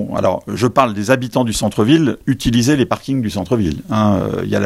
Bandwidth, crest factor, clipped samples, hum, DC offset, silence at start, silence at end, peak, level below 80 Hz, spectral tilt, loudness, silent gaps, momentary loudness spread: 16 kHz; 16 dB; under 0.1%; none; under 0.1%; 0 s; 0 s; 0 dBFS; -38 dBFS; -6 dB/octave; -16 LUFS; none; 5 LU